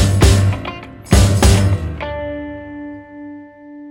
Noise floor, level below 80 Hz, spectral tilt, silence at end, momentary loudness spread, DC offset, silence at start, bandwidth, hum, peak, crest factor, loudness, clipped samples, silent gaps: -36 dBFS; -22 dBFS; -5.5 dB/octave; 0 s; 22 LU; under 0.1%; 0 s; 16.5 kHz; none; 0 dBFS; 16 dB; -15 LUFS; under 0.1%; none